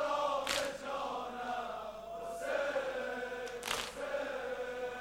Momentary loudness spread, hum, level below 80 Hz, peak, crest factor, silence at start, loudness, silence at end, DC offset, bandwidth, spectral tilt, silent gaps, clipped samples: 8 LU; none; -64 dBFS; -14 dBFS; 24 dB; 0 s; -38 LUFS; 0 s; under 0.1%; 17 kHz; -2 dB/octave; none; under 0.1%